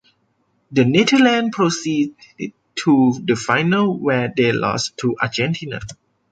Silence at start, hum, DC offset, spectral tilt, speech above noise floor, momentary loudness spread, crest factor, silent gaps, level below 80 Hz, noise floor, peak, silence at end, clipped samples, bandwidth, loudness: 0.7 s; none; under 0.1%; -5 dB/octave; 47 dB; 15 LU; 16 dB; none; -54 dBFS; -65 dBFS; -2 dBFS; 0.35 s; under 0.1%; 9.2 kHz; -18 LUFS